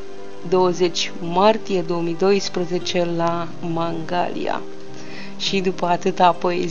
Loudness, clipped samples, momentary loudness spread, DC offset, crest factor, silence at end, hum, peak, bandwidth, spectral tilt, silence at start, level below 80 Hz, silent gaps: -21 LUFS; under 0.1%; 16 LU; 4%; 20 dB; 0 s; none; -2 dBFS; 7.6 kHz; -5 dB/octave; 0 s; -58 dBFS; none